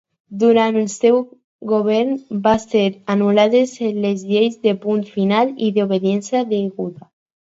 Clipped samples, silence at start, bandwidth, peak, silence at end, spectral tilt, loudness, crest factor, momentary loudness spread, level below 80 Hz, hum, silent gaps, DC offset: under 0.1%; 0.3 s; 8 kHz; -2 dBFS; 0.65 s; -6 dB/octave; -17 LUFS; 16 dB; 7 LU; -58 dBFS; none; 1.44-1.59 s; under 0.1%